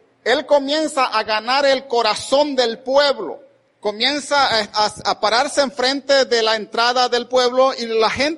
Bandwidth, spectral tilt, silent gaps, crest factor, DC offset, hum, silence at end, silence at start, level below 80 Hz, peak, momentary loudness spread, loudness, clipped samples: 11.5 kHz; -2 dB/octave; none; 16 dB; under 0.1%; none; 0 s; 0.25 s; -56 dBFS; -2 dBFS; 4 LU; -17 LUFS; under 0.1%